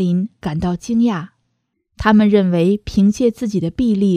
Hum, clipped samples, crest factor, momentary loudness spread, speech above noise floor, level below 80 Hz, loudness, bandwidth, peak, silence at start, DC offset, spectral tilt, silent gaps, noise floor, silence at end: none; under 0.1%; 16 dB; 9 LU; 54 dB; -40 dBFS; -17 LUFS; 10.5 kHz; 0 dBFS; 0 s; under 0.1%; -7.5 dB/octave; none; -70 dBFS; 0 s